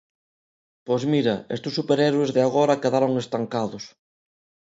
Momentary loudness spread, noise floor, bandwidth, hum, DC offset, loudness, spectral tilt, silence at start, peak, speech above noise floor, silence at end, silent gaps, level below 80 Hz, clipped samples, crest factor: 8 LU; under -90 dBFS; 8 kHz; none; under 0.1%; -23 LUFS; -6 dB/octave; 0.85 s; -6 dBFS; over 68 dB; 0.8 s; none; -66 dBFS; under 0.1%; 18 dB